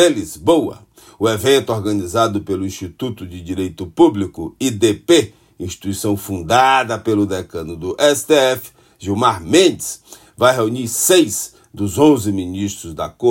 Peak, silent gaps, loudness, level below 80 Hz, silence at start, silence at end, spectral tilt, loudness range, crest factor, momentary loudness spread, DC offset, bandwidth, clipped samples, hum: 0 dBFS; none; -17 LUFS; -52 dBFS; 0 s; 0 s; -4 dB/octave; 3 LU; 16 dB; 14 LU; under 0.1%; 16.5 kHz; under 0.1%; none